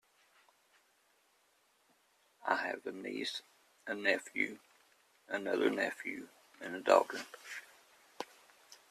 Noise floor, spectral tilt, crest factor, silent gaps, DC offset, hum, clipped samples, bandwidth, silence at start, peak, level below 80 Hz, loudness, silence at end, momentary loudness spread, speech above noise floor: -73 dBFS; -3 dB/octave; 28 dB; none; under 0.1%; none; under 0.1%; 14 kHz; 2.4 s; -12 dBFS; -84 dBFS; -36 LUFS; 0.15 s; 19 LU; 37 dB